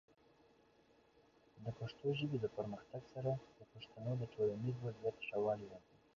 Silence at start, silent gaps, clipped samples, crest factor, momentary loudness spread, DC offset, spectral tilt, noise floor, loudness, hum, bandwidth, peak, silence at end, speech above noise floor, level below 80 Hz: 1.55 s; none; under 0.1%; 16 dB; 15 LU; under 0.1%; -6.5 dB/octave; -71 dBFS; -43 LUFS; none; 7.2 kHz; -28 dBFS; 0.35 s; 29 dB; -74 dBFS